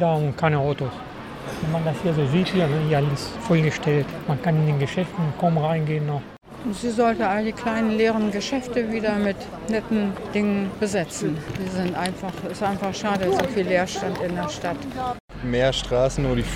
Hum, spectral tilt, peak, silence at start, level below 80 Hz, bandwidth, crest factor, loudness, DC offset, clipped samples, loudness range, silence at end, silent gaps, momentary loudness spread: none; -6.5 dB/octave; -4 dBFS; 0 s; -44 dBFS; 14.5 kHz; 18 dB; -24 LUFS; under 0.1%; under 0.1%; 3 LU; 0 s; 15.20-15.28 s; 8 LU